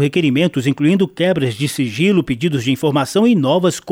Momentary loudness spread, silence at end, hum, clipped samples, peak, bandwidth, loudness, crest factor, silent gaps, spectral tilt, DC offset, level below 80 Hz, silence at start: 4 LU; 0 s; none; under 0.1%; -4 dBFS; 17 kHz; -16 LUFS; 12 dB; none; -6 dB/octave; under 0.1%; -52 dBFS; 0 s